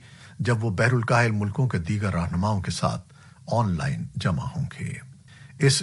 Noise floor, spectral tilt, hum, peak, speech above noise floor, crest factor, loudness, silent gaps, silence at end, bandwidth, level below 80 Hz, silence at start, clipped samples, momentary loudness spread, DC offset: -47 dBFS; -5.5 dB/octave; none; -6 dBFS; 23 dB; 18 dB; -25 LUFS; none; 0 s; 11.5 kHz; -48 dBFS; 0.05 s; under 0.1%; 11 LU; under 0.1%